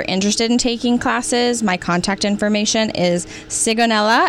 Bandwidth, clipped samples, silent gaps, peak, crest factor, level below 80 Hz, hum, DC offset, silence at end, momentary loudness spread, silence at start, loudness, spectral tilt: 13 kHz; under 0.1%; none; -6 dBFS; 12 dB; -44 dBFS; none; under 0.1%; 0 s; 4 LU; 0 s; -17 LUFS; -3.5 dB/octave